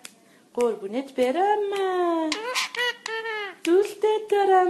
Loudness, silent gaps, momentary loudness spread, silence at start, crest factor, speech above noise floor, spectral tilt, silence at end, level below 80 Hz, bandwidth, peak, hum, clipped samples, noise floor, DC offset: -25 LUFS; none; 9 LU; 0.55 s; 16 dB; 25 dB; -2.5 dB/octave; 0 s; -74 dBFS; 13 kHz; -8 dBFS; none; under 0.1%; -49 dBFS; under 0.1%